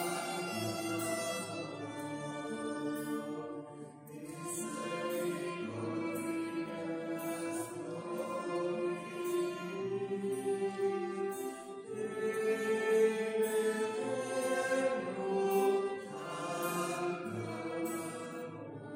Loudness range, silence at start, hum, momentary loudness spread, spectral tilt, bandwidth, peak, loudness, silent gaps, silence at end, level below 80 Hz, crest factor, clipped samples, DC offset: 7 LU; 0 s; none; 10 LU; -4.5 dB/octave; 16 kHz; -18 dBFS; -37 LUFS; none; 0 s; -80 dBFS; 18 dB; under 0.1%; under 0.1%